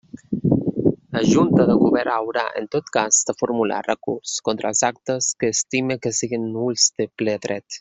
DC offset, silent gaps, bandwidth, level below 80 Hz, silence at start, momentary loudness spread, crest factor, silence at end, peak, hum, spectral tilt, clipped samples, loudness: under 0.1%; none; 8.2 kHz; -56 dBFS; 0.15 s; 9 LU; 18 dB; 0 s; -4 dBFS; none; -4 dB/octave; under 0.1%; -20 LUFS